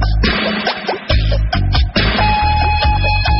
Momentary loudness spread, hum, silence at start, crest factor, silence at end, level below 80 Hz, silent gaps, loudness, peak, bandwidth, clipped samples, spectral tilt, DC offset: 4 LU; none; 0 s; 12 dB; 0 s; -18 dBFS; none; -15 LUFS; -2 dBFS; 6 kHz; under 0.1%; -3.5 dB/octave; under 0.1%